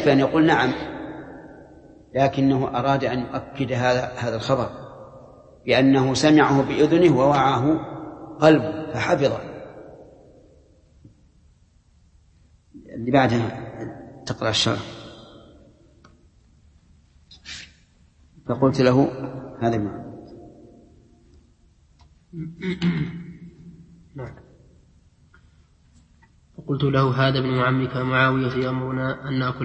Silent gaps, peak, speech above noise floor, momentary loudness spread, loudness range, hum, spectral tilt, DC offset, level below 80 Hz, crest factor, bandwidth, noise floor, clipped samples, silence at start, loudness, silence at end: none; -2 dBFS; 37 dB; 22 LU; 13 LU; none; -6 dB/octave; under 0.1%; -52 dBFS; 22 dB; 8.6 kHz; -57 dBFS; under 0.1%; 0 s; -21 LUFS; 0 s